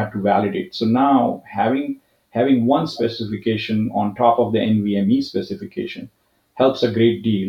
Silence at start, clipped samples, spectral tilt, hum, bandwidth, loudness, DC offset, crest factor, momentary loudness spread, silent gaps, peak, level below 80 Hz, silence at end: 0 s; under 0.1%; -8 dB/octave; none; 7.2 kHz; -19 LUFS; under 0.1%; 18 dB; 12 LU; none; -2 dBFS; -60 dBFS; 0 s